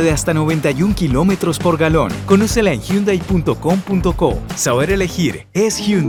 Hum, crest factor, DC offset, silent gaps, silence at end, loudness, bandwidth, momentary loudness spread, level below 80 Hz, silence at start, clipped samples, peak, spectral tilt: none; 14 dB; under 0.1%; none; 0 s; -16 LUFS; 18.5 kHz; 4 LU; -30 dBFS; 0 s; under 0.1%; 0 dBFS; -5.5 dB/octave